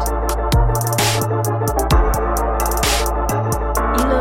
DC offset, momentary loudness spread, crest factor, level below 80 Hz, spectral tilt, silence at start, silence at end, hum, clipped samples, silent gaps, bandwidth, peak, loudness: under 0.1%; 3 LU; 16 dB; -22 dBFS; -4.5 dB/octave; 0 s; 0 s; none; under 0.1%; none; 17 kHz; -2 dBFS; -18 LUFS